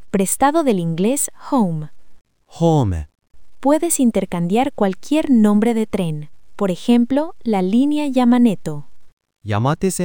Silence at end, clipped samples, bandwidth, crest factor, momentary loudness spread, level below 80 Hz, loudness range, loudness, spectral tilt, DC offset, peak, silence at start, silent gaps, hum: 0 s; under 0.1%; 18 kHz; 16 dB; 11 LU; -44 dBFS; 2 LU; -18 LUFS; -6 dB/octave; 2%; -2 dBFS; 0.15 s; 9.13-9.17 s; none